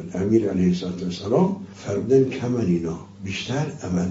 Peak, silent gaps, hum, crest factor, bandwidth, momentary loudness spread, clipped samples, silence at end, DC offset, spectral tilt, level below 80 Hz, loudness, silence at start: -6 dBFS; none; none; 16 dB; 7.8 kHz; 11 LU; under 0.1%; 0 s; under 0.1%; -7 dB/octave; -56 dBFS; -23 LUFS; 0 s